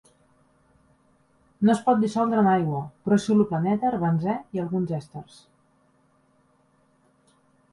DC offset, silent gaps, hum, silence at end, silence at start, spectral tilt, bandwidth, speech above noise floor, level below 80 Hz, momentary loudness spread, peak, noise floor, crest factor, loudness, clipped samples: under 0.1%; none; none; 2.5 s; 1.6 s; -7.5 dB/octave; 11.5 kHz; 41 dB; -62 dBFS; 10 LU; -8 dBFS; -64 dBFS; 18 dB; -24 LUFS; under 0.1%